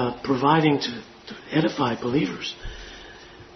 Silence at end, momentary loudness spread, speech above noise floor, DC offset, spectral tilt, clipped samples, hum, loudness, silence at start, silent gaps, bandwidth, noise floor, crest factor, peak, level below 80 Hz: 0 s; 21 LU; 22 dB; under 0.1%; -6 dB/octave; under 0.1%; none; -23 LUFS; 0 s; none; 6.4 kHz; -45 dBFS; 20 dB; -4 dBFS; -48 dBFS